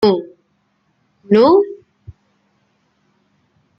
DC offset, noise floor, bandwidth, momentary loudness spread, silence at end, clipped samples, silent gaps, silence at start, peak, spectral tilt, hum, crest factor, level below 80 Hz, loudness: under 0.1%; -63 dBFS; 5.8 kHz; 26 LU; 2.05 s; under 0.1%; none; 0 s; -2 dBFS; -8.5 dB/octave; none; 16 dB; -58 dBFS; -14 LUFS